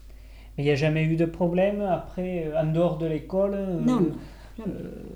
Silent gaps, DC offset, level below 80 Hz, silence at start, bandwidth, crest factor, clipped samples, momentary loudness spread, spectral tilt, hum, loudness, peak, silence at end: none; under 0.1%; -46 dBFS; 0 s; 10 kHz; 16 dB; under 0.1%; 13 LU; -8 dB/octave; none; -26 LUFS; -10 dBFS; 0 s